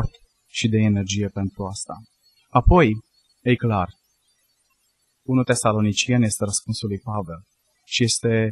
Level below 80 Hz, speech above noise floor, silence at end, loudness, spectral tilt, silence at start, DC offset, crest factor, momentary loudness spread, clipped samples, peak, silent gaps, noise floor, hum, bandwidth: -34 dBFS; 48 dB; 0 s; -22 LUFS; -5 dB/octave; 0 s; under 0.1%; 20 dB; 14 LU; under 0.1%; -2 dBFS; none; -68 dBFS; none; 12.5 kHz